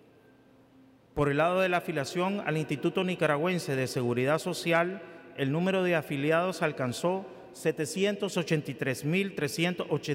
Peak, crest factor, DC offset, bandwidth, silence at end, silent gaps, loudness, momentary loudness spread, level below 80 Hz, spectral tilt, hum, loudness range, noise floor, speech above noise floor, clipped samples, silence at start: -12 dBFS; 16 dB; under 0.1%; 16 kHz; 0 s; none; -29 LUFS; 6 LU; -62 dBFS; -5.5 dB/octave; none; 2 LU; -59 dBFS; 30 dB; under 0.1%; 1.15 s